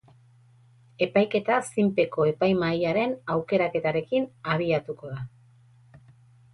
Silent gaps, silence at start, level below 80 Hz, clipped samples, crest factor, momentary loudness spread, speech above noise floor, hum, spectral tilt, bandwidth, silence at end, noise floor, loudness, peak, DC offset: none; 1 s; -62 dBFS; under 0.1%; 18 dB; 9 LU; 32 dB; none; -6.5 dB/octave; 11.5 kHz; 0.55 s; -57 dBFS; -25 LUFS; -10 dBFS; under 0.1%